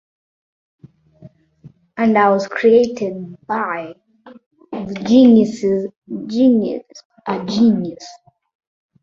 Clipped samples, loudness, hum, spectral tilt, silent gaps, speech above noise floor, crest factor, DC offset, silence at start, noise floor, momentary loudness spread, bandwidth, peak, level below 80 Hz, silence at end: under 0.1%; -16 LUFS; none; -6.5 dB/octave; 4.46-4.51 s, 5.96-6.02 s, 7.05-7.10 s; 31 dB; 16 dB; under 0.1%; 1.2 s; -46 dBFS; 20 LU; 7.4 kHz; -2 dBFS; -58 dBFS; 0.9 s